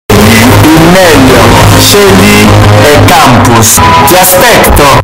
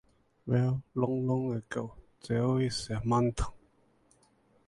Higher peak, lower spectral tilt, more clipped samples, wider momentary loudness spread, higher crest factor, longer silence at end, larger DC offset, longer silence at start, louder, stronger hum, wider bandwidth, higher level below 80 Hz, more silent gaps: first, 0 dBFS vs -14 dBFS; second, -4 dB/octave vs -7 dB/octave; first, 9% vs under 0.1%; second, 1 LU vs 11 LU; second, 2 dB vs 18 dB; second, 0 s vs 1.1 s; neither; second, 0.1 s vs 0.45 s; first, -1 LUFS vs -31 LUFS; neither; first, over 20 kHz vs 11.5 kHz; first, -16 dBFS vs -48 dBFS; neither